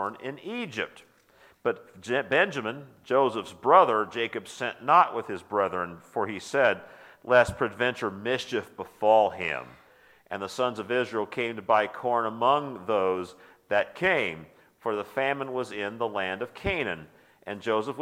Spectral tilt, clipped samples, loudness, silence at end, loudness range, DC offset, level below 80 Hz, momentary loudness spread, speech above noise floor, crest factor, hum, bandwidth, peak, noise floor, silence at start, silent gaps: -5 dB/octave; under 0.1%; -27 LUFS; 0 s; 5 LU; under 0.1%; -58 dBFS; 14 LU; 32 dB; 22 dB; none; 15.5 kHz; -6 dBFS; -59 dBFS; 0 s; none